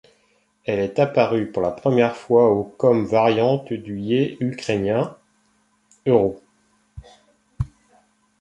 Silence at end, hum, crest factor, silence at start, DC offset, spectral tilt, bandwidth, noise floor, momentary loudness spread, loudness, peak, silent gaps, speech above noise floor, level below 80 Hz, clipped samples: 0.75 s; none; 20 dB; 0.7 s; under 0.1%; -7.5 dB/octave; 10.5 kHz; -63 dBFS; 13 LU; -21 LUFS; -2 dBFS; none; 44 dB; -48 dBFS; under 0.1%